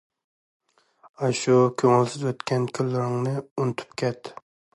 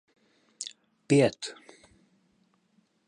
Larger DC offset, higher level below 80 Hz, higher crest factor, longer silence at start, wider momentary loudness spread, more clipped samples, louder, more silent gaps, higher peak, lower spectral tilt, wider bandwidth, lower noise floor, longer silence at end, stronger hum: neither; about the same, -68 dBFS vs -70 dBFS; about the same, 18 dB vs 22 dB; first, 1.2 s vs 0.6 s; second, 9 LU vs 17 LU; neither; first, -24 LUFS vs -28 LUFS; first, 3.51-3.56 s vs none; first, -6 dBFS vs -10 dBFS; about the same, -6 dB/octave vs -5.5 dB/octave; about the same, 11.5 kHz vs 11 kHz; second, -58 dBFS vs -70 dBFS; second, 0.4 s vs 1.55 s; neither